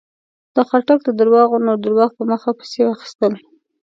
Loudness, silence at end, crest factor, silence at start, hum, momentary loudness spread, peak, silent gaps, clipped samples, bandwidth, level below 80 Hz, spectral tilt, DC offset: -16 LUFS; 0.6 s; 16 dB; 0.55 s; none; 8 LU; 0 dBFS; 3.15-3.19 s; under 0.1%; 7.6 kHz; -70 dBFS; -6.5 dB/octave; under 0.1%